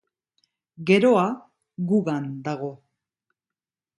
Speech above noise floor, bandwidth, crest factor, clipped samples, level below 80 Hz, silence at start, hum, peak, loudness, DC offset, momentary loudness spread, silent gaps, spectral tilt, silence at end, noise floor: over 68 dB; 11 kHz; 22 dB; under 0.1%; -70 dBFS; 0.8 s; none; -4 dBFS; -23 LUFS; under 0.1%; 15 LU; none; -7 dB/octave; 1.25 s; under -90 dBFS